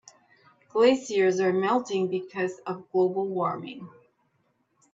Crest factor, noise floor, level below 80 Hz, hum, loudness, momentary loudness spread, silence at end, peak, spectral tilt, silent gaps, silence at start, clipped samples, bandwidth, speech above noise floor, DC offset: 18 dB; -71 dBFS; -74 dBFS; none; -26 LUFS; 13 LU; 1.05 s; -8 dBFS; -5.5 dB/octave; none; 0.75 s; under 0.1%; 7.8 kHz; 46 dB; under 0.1%